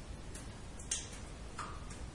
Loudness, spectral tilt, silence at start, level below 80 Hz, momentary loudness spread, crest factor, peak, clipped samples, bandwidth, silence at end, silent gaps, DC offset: -44 LUFS; -2.5 dB/octave; 0 s; -50 dBFS; 9 LU; 26 dB; -18 dBFS; under 0.1%; 11.5 kHz; 0 s; none; under 0.1%